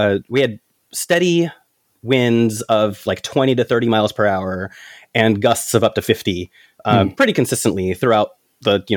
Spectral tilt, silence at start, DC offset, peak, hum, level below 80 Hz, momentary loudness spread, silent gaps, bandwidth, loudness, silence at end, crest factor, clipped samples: -5 dB/octave; 0 s; under 0.1%; 0 dBFS; none; -58 dBFS; 10 LU; none; 18 kHz; -17 LUFS; 0 s; 18 dB; under 0.1%